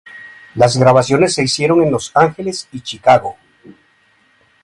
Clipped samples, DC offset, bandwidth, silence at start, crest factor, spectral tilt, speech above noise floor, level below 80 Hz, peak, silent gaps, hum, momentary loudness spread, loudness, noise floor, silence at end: under 0.1%; under 0.1%; 11.5 kHz; 0.15 s; 16 dB; -5 dB/octave; 42 dB; -50 dBFS; 0 dBFS; none; none; 17 LU; -13 LUFS; -55 dBFS; 0.95 s